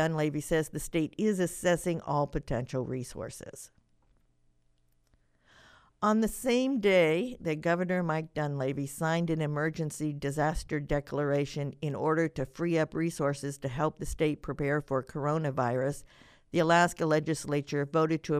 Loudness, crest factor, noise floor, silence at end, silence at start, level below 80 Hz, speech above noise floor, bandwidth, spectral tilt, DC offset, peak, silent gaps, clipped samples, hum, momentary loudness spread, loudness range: -30 LUFS; 20 dB; -69 dBFS; 0 s; 0 s; -50 dBFS; 39 dB; 15.5 kHz; -6 dB/octave; under 0.1%; -10 dBFS; none; under 0.1%; none; 8 LU; 7 LU